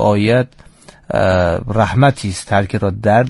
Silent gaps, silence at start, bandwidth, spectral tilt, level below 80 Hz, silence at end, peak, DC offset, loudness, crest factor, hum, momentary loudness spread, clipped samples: none; 0 s; 11.5 kHz; -6.5 dB/octave; -38 dBFS; 0 s; 0 dBFS; under 0.1%; -15 LUFS; 14 dB; none; 7 LU; under 0.1%